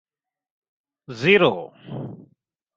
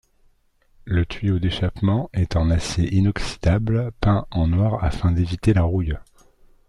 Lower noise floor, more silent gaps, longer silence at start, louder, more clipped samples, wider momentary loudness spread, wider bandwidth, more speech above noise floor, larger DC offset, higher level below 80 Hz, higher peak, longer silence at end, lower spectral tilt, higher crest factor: first, -64 dBFS vs -59 dBFS; neither; first, 1.1 s vs 0.85 s; first, -18 LUFS vs -22 LUFS; neither; first, 21 LU vs 4 LU; second, 7.4 kHz vs 11 kHz; first, 44 dB vs 39 dB; neither; second, -64 dBFS vs -34 dBFS; about the same, -2 dBFS vs -4 dBFS; about the same, 0.6 s vs 0.65 s; about the same, -6 dB/octave vs -7 dB/octave; first, 22 dB vs 16 dB